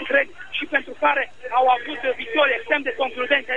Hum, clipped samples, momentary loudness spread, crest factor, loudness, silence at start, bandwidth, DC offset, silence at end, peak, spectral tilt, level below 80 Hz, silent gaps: none; under 0.1%; 7 LU; 18 dB; -21 LUFS; 0 s; 8.4 kHz; 1%; 0 s; -4 dBFS; -3.5 dB/octave; -60 dBFS; none